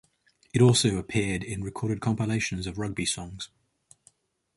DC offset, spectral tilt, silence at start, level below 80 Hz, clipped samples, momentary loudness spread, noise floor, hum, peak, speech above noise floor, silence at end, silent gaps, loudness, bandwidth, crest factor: under 0.1%; -5 dB/octave; 0.55 s; -50 dBFS; under 0.1%; 14 LU; -65 dBFS; none; -8 dBFS; 39 dB; 1.1 s; none; -27 LUFS; 11.5 kHz; 20 dB